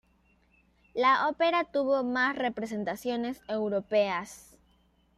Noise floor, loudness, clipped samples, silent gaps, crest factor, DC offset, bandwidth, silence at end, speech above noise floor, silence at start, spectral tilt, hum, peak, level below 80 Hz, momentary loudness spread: -67 dBFS; -29 LUFS; under 0.1%; none; 18 dB; under 0.1%; 14 kHz; 0.75 s; 38 dB; 0.95 s; -4.5 dB/octave; none; -12 dBFS; -66 dBFS; 9 LU